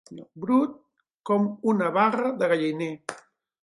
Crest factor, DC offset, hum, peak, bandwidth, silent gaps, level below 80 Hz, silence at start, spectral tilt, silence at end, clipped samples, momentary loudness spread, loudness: 18 dB; under 0.1%; none; -8 dBFS; 11.5 kHz; 1.14-1.18 s; -76 dBFS; 0.1 s; -6.5 dB/octave; 0.45 s; under 0.1%; 15 LU; -25 LUFS